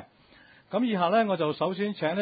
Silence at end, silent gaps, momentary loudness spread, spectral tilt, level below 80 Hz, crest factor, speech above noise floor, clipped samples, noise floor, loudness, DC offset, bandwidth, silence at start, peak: 0 s; none; 5 LU; -10.5 dB/octave; -72 dBFS; 16 dB; 31 dB; under 0.1%; -57 dBFS; -27 LUFS; under 0.1%; 5 kHz; 0 s; -12 dBFS